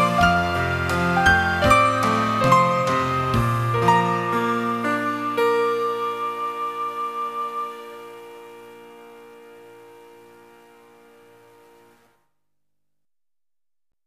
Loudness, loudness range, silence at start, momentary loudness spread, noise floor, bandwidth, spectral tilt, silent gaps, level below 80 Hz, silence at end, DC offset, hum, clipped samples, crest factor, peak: -20 LUFS; 15 LU; 0 s; 15 LU; under -90 dBFS; 15.5 kHz; -5.5 dB/octave; none; -44 dBFS; 4.2 s; under 0.1%; 50 Hz at -60 dBFS; under 0.1%; 20 dB; -2 dBFS